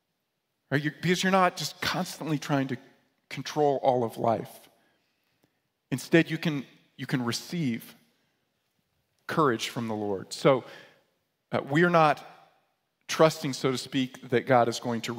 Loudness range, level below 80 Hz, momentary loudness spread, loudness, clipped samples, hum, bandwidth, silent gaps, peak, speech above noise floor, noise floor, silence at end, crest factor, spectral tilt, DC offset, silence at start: 5 LU; -72 dBFS; 12 LU; -27 LUFS; under 0.1%; none; 16 kHz; none; -6 dBFS; 53 dB; -80 dBFS; 0 s; 22 dB; -5 dB/octave; under 0.1%; 0.7 s